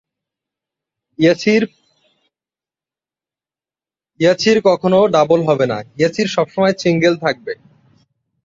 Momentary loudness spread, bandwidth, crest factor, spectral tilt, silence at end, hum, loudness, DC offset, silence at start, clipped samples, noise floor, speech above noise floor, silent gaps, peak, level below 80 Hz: 8 LU; 7.8 kHz; 16 dB; -5.5 dB/octave; 0.9 s; none; -15 LUFS; under 0.1%; 1.2 s; under 0.1%; under -90 dBFS; over 76 dB; none; -2 dBFS; -58 dBFS